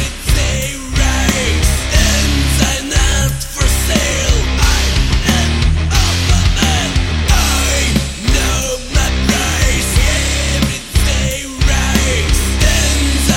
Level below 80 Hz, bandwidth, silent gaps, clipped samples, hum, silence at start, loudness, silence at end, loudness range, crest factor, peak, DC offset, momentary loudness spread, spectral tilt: -16 dBFS; 16.5 kHz; none; under 0.1%; none; 0 s; -14 LUFS; 0 s; 1 LU; 12 dB; 0 dBFS; under 0.1%; 4 LU; -3.5 dB/octave